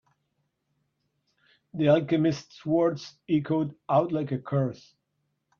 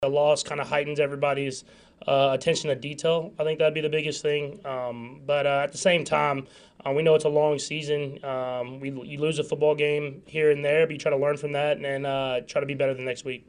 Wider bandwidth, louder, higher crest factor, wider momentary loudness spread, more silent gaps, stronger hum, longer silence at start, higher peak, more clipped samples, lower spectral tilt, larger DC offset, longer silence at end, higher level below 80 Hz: second, 7 kHz vs 10.5 kHz; about the same, -26 LUFS vs -26 LUFS; about the same, 20 dB vs 18 dB; about the same, 9 LU vs 10 LU; neither; neither; first, 1.75 s vs 0 s; about the same, -8 dBFS vs -8 dBFS; neither; first, -8 dB/octave vs -4.5 dB/octave; neither; first, 0.85 s vs 0.1 s; about the same, -68 dBFS vs -64 dBFS